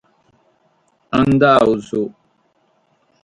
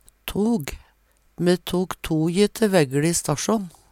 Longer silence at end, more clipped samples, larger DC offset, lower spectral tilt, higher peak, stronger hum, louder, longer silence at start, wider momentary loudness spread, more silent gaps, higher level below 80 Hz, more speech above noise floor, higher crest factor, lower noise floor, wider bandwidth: first, 1.15 s vs 0.25 s; neither; neither; first, -7.5 dB/octave vs -5 dB/octave; first, 0 dBFS vs -4 dBFS; neither; first, -15 LUFS vs -22 LUFS; first, 1.1 s vs 0.25 s; first, 12 LU vs 7 LU; neither; about the same, -48 dBFS vs -46 dBFS; first, 47 dB vs 39 dB; about the same, 18 dB vs 18 dB; about the same, -61 dBFS vs -61 dBFS; second, 11 kHz vs 17 kHz